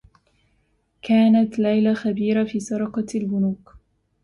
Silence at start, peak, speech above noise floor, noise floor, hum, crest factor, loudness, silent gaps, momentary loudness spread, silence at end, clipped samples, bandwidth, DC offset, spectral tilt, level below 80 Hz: 1.05 s; -8 dBFS; 46 dB; -66 dBFS; none; 14 dB; -21 LUFS; none; 9 LU; 0.45 s; under 0.1%; 11 kHz; under 0.1%; -7 dB/octave; -58 dBFS